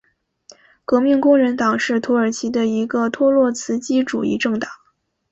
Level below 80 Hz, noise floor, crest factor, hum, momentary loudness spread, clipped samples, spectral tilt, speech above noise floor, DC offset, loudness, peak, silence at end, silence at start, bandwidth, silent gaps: -60 dBFS; -64 dBFS; 16 dB; none; 7 LU; under 0.1%; -4.5 dB/octave; 47 dB; under 0.1%; -18 LUFS; -4 dBFS; 0.55 s; 0.9 s; 8.2 kHz; none